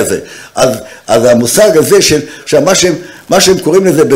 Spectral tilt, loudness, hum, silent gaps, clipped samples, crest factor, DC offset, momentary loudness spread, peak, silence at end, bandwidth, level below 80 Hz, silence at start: -3.5 dB/octave; -8 LUFS; none; none; under 0.1%; 8 dB; under 0.1%; 9 LU; 0 dBFS; 0 s; 16.5 kHz; -40 dBFS; 0 s